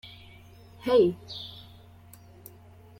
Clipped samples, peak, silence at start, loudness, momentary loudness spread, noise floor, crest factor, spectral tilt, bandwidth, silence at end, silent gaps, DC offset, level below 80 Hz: under 0.1%; -10 dBFS; 0.05 s; -26 LUFS; 27 LU; -52 dBFS; 20 dB; -6.5 dB/octave; 16.5 kHz; 1.5 s; none; under 0.1%; -62 dBFS